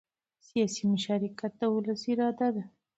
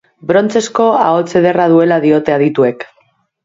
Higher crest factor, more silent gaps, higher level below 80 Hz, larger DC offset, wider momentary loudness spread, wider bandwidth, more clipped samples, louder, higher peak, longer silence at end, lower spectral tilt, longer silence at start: about the same, 14 dB vs 12 dB; neither; second, -74 dBFS vs -56 dBFS; neither; about the same, 6 LU vs 5 LU; about the same, 8.2 kHz vs 7.8 kHz; neither; second, -30 LUFS vs -12 LUFS; second, -16 dBFS vs 0 dBFS; second, 0.3 s vs 0.6 s; about the same, -5.5 dB/octave vs -6 dB/octave; first, 0.55 s vs 0.25 s